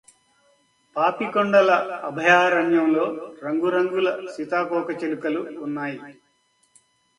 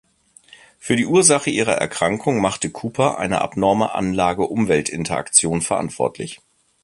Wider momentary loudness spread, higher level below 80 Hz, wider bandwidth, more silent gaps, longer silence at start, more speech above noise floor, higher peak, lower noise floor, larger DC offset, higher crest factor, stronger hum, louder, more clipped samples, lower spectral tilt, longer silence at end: first, 13 LU vs 10 LU; second, -72 dBFS vs -50 dBFS; about the same, 11 kHz vs 11.5 kHz; neither; about the same, 0.95 s vs 0.85 s; first, 44 dB vs 31 dB; second, -4 dBFS vs 0 dBFS; first, -65 dBFS vs -50 dBFS; neither; about the same, 20 dB vs 20 dB; neither; second, -22 LUFS vs -19 LUFS; neither; first, -5.5 dB/octave vs -3.5 dB/octave; first, 1.05 s vs 0.45 s